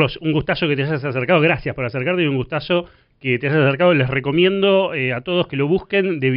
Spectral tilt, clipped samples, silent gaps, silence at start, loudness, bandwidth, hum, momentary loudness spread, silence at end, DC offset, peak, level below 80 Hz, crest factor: -4.5 dB/octave; under 0.1%; none; 0 s; -18 LUFS; 5.6 kHz; none; 6 LU; 0 s; under 0.1%; -4 dBFS; -46 dBFS; 14 dB